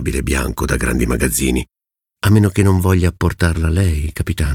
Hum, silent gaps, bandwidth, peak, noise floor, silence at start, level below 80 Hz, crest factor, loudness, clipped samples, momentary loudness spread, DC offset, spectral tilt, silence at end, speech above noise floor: none; none; 17.5 kHz; -2 dBFS; -67 dBFS; 0 s; -24 dBFS; 14 dB; -16 LUFS; under 0.1%; 7 LU; under 0.1%; -5.5 dB/octave; 0 s; 52 dB